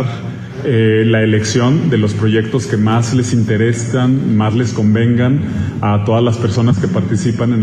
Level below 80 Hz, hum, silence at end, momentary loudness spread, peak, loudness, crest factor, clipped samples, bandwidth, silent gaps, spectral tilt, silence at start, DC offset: -46 dBFS; none; 0 s; 4 LU; -2 dBFS; -14 LUFS; 12 dB; under 0.1%; 9.4 kHz; none; -6.5 dB/octave; 0 s; under 0.1%